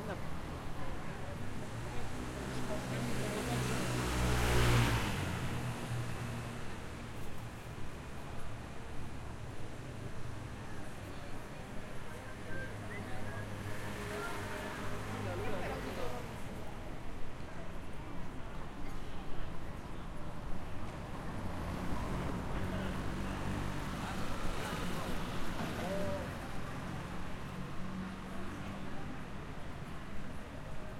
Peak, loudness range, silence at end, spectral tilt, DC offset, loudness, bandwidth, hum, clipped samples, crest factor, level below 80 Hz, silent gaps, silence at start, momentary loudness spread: -16 dBFS; 12 LU; 0 s; -5.5 dB/octave; under 0.1%; -41 LUFS; 16 kHz; none; under 0.1%; 20 dB; -46 dBFS; none; 0 s; 11 LU